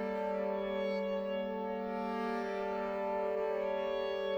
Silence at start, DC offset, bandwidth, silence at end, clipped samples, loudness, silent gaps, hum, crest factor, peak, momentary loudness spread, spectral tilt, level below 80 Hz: 0 s; under 0.1%; over 20 kHz; 0 s; under 0.1%; -36 LUFS; none; none; 12 dB; -24 dBFS; 3 LU; -6.5 dB/octave; -66 dBFS